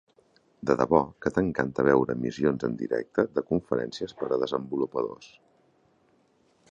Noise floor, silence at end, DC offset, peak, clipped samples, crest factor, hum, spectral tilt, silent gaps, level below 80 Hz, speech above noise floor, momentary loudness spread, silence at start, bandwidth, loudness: -66 dBFS; 1.45 s; under 0.1%; -6 dBFS; under 0.1%; 22 dB; none; -7 dB/octave; none; -56 dBFS; 39 dB; 10 LU; 0.6 s; 7.8 kHz; -27 LUFS